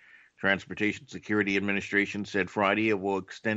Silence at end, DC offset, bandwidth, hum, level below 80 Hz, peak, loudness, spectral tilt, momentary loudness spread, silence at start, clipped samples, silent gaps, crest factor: 0 s; under 0.1%; 8 kHz; none; -68 dBFS; -10 dBFS; -28 LUFS; -5.5 dB/octave; 5 LU; 0.4 s; under 0.1%; none; 20 dB